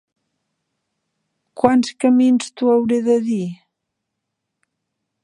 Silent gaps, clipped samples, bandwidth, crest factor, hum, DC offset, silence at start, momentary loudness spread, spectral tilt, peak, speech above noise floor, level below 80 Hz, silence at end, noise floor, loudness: none; under 0.1%; 10.5 kHz; 20 dB; none; under 0.1%; 1.55 s; 8 LU; -6 dB/octave; 0 dBFS; 63 dB; -64 dBFS; 1.7 s; -78 dBFS; -17 LUFS